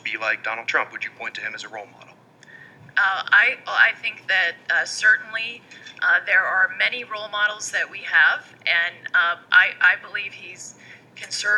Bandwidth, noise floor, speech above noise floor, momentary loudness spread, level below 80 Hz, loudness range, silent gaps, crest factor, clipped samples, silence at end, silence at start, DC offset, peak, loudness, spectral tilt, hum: 12 kHz; -49 dBFS; 27 dB; 16 LU; -80 dBFS; 3 LU; none; 20 dB; under 0.1%; 0 s; 0.05 s; under 0.1%; -2 dBFS; -20 LUFS; 0 dB/octave; none